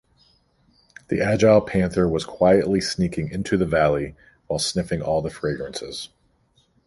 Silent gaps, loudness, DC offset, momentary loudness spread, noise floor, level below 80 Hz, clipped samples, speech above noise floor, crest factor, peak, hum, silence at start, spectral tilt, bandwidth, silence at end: none; -22 LUFS; under 0.1%; 14 LU; -63 dBFS; -44 dBFS; under 0.1%; 42 dB; 18 dB; -4 dBFS; none; 1.1 s; -5.5 dB/octave; 11.5 kHz; 0.8 s